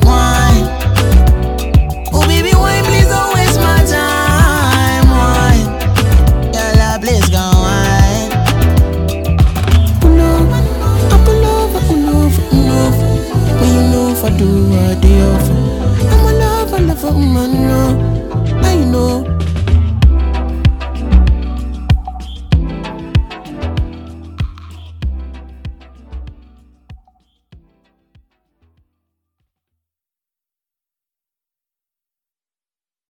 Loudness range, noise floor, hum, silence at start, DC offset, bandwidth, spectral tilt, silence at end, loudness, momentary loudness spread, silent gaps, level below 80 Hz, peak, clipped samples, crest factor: 10 LU; under -90 dBFS; none; 0 s; under 0.1%; 19.5 kHz; -6 dB/octave; 6.15 s; -12 LUFS; 12 LU; none; -16 dBFS; 0 dBFS; under 0.1%; 12 dB